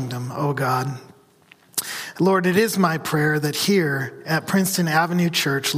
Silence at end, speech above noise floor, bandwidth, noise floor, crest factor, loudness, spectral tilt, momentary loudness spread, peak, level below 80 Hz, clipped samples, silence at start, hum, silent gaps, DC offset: 0 s; 33 dB; 15.5 kHz; -54 dBFS; 16 dB; -21 LUFS; -4.5 dB/octave; 9 LU; -4 dBFS; -62 dBFS; under 0.1%; 0 s; none; none; under 0.1%